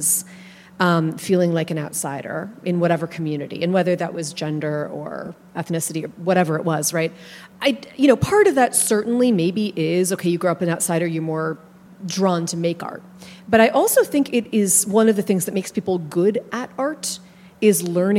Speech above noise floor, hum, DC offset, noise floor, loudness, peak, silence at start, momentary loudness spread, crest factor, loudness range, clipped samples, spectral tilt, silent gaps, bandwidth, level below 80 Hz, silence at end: 23 dB; none; under 0.1%; -43 dBFS; -20 LUFS; 0 dBFS; 0 s; 13 LU; 20 dB; 5 LU; under 0.1%; -4.5 dB/octave; none; 16.5 kHz; -58 dBFS; 0 s